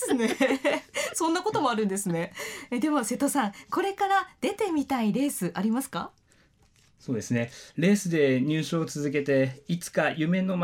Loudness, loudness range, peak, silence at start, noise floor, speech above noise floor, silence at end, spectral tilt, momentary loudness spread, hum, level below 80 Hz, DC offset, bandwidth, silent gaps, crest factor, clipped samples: -27 LUFS; 3 LU; -12 dBFS; 0 s; -62 dBFS; 35 dB; 0 s; -5 dB/octave; 9 LU; none; -68 dBFS; under 0.1%; 17.5 kHz; none; 16 dB; under 0.1%